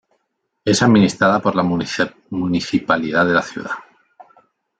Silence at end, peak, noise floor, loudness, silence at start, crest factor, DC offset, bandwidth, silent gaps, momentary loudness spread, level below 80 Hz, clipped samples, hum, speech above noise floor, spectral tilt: 1 s; -2 dBFS; -72 dBFS; -17 LUFS; 0.65 s; 16 dB; under 0.1%; 9.2 kHz; none; 13 LU; -54 dBFS; under 0.1%; none; 55 dB; -5 dB/octave